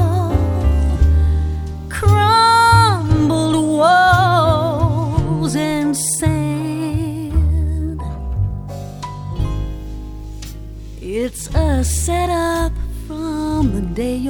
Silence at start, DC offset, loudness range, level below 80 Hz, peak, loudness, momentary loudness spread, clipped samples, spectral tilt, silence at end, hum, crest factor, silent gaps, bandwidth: 0 s; under 0.1%; 11 LU; -22 dBFS; 0 dBFS; -16 LUFS; 17 LU; under 0.1%; -5.5 dB/octave; 0 s; none; 16 dB; none; 18.5 kHz